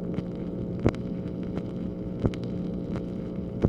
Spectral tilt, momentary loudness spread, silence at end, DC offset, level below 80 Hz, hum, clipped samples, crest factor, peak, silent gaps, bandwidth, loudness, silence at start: -9 dB/octave; 6 LU; 0 s; under 0.1%; -44 dBFS; none; under 0.1%; 24 dB; -6 dBFS; none; 8 kHz; -32 LUFS; 0 s